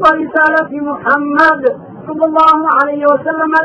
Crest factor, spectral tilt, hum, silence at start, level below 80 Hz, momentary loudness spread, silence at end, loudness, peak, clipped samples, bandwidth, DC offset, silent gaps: 12 dB; -6 dB/octave; none; 0 s; -50 dBFS; 9 LU; 0 s; -11 LUFS; 0 dBFS; under 0.1%; 10 kHz; under 0.1%; none